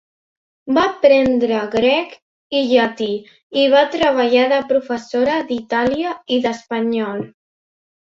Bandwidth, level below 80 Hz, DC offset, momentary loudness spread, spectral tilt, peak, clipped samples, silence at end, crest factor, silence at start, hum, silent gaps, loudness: 7.6 kHz; -56 dBFS; under 0.1%; 10 LU; -5 dB/octave; -2 dBFS; under 0.1%; 0.75 s; 16 dB; 0.65 s; none; 2.22-2.50 s, 3.43-3.50 s; -17 LUFS